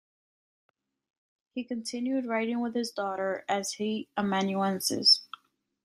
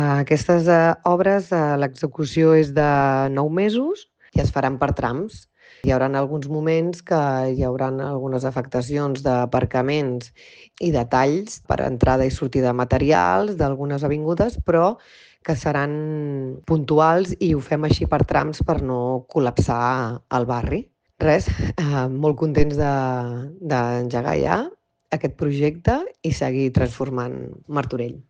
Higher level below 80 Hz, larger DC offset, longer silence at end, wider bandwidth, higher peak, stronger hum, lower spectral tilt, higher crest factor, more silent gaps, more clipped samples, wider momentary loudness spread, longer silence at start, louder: second, -76 dBFS vs -38 dBFS; neither; first, 0.6 s vs 0.1 s; first, 14.5 kHz vs 9.2 kHz; second, -10 dBFS vs -4 dBFS; neither; second, -3.5 dB/octave vs -7.5 dB/octave; first, 22 dB vs 16 dB; neither; neither; first, 15 LU vs 9 LU; first, 1.55 s vs 0 s; second, -28 LUFS vs -21 LUFS